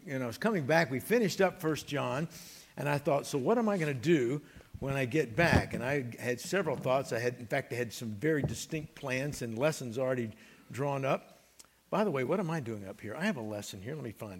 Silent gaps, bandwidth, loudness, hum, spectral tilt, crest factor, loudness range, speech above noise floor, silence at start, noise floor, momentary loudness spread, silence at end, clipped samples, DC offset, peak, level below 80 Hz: none; 16.5 kHz; -33 LUFS; none; -5.5 dB/octave; 22 dB; 4 LU; 29 dB; 0 s; -61 dBFS; 12 LU; 0 s; under 0.1%; under 0.1%; -10 dBFS; -58 dBFS